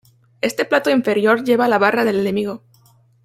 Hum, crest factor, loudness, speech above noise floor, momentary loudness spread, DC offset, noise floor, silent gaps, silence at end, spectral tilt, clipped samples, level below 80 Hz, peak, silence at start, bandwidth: none; 16 dB; -17 LUFS; 37 dB; 9 LU; under 0.1%; -53 dBFS; none; 0.7 s; -5 dB/octave; under 0.1%; -62 dBFS; -2 dBFS; 0.45 s; 16 kHz